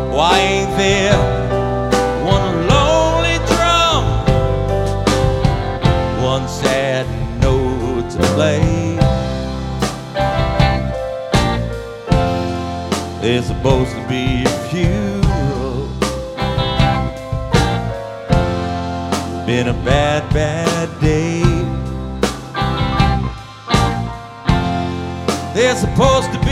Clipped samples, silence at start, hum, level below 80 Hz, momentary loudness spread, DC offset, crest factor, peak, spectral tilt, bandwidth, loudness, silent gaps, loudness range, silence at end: under 0.1%; 0 s; none; -24 dBFS; 8 LU; under 0.1%; 16 dB; 0 dBFS; -5.5 dB/octave; 15 kHz; -17 LUFS; none; 4 LU; 0 s